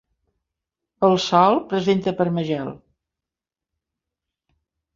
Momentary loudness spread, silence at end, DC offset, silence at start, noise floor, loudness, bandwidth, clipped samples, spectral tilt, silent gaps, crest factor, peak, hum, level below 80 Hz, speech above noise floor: 10 LU; 2.2 s; under 0.1%; 1 s; -88 dBFS; -20 LUFS; 7.6 kHz; under 0.1%; -6 dB/octave; none; 22 dB; -2 dBFS; none; -62 dBFS; 69 dB